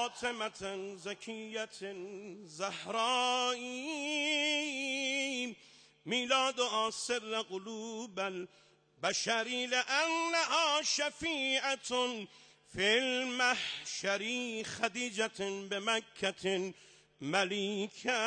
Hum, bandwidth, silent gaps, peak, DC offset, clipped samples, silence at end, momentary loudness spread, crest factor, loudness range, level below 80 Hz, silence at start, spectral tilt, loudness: none; 10 kHz; none; -18 dBFS; under 0.1%; under 0.1%; 0 s; 13 LU; 18 dB; 4 LU; -74 dBFS; 0 s; -1.5 dB/octave; -34 LUFS